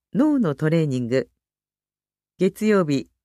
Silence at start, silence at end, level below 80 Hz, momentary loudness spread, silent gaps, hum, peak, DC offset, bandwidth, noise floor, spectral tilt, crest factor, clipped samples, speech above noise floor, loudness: 0.15 s; 0.2 s; -62 dBFS; 5 LU; none; 50 Hz at -55 dBFS; -8 dBFS; under 0.1%; 14 kHz; under -90 dBFS; -7.5 dB/octave; 14 dB; under 0.1%; over 70 dB; -22 LUFS